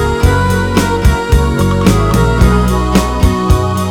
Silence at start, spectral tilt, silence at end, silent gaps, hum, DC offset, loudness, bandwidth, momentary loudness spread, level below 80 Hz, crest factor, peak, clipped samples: 0 s; -6 dB/octave; 0 s; none; none; 0.9%; -12 LUFS; 18 kHz; 2 LU; -16 dBFS; 10 dB; 0 dBFS; 0.3%